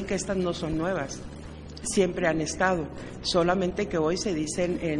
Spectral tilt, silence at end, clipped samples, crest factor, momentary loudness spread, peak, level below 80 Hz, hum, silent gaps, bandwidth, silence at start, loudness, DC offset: -4.5 dB/octave; 0 s; under 0.1%; 20 dB; 12 LU; -8 dBFS; -46 dBFS; none; none; 11.5 kHz; 0 s; -27 LUFS; under 0.1%